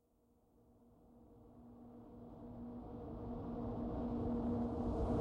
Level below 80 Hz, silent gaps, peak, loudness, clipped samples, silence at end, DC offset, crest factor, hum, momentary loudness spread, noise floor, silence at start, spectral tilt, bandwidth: -52 dBFS; none; -28 dBFS; -43 LUFS; under 0.1%; 0 s; under 0.1%; 16 dB; none; 21 LU; -74 dBFS; 0.7 s; -10 dB/octave; 5.6 kHz